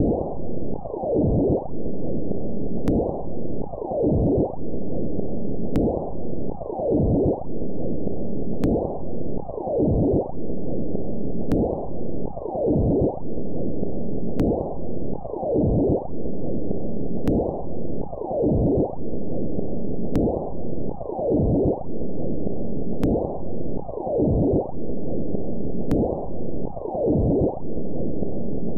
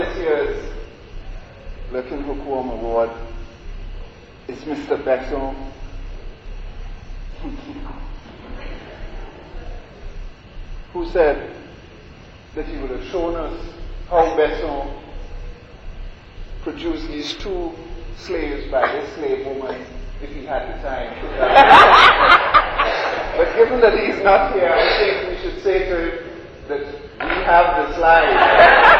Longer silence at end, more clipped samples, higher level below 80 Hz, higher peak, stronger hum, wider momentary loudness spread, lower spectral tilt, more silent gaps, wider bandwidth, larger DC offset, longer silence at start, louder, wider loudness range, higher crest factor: about the same, 0 s vs 0 s; neither; about the same, -36 dBFS vs -32 dBFS; second, -8 dBFS vs 0 dBFS; neither; second, 10 LU vs 26 LU; first, -11.5 dB/octave vs -5 dB/octave; neither; second, 7.8 kHz vs 10 kHz; first, 7% vs under 0.1%; about the same, 0 s vs 0 s; second, -26 LUFS vs -16 LUFS; second, 1 LU vs 23 LU; about the same, 16 dB vs 18 dB